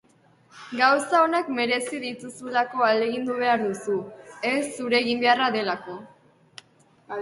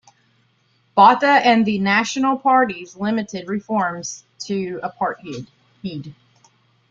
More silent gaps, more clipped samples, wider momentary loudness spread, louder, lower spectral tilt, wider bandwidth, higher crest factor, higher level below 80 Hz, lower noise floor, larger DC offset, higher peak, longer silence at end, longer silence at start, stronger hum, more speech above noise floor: neither; neither; second, 14 LU vs 19 LU; second, -24 LUFS vs -18 LUFS; about the same, -3.5 dB/octave vs -4.5 dB/octave; first, 11.5 kHz vs 7.8 kHz; about the same, 20 dB vs 18 dB; second, -72 dBFS vs -62 dBFS; about the same, -59 dBFS vs -62 dBFS; neither; second, -6 dBFS vs -2 dBFS; second, 0 s vs 0.8 s; second, 0.55 s vs 0.95 s; neither; second, 35 dB vs 43 dB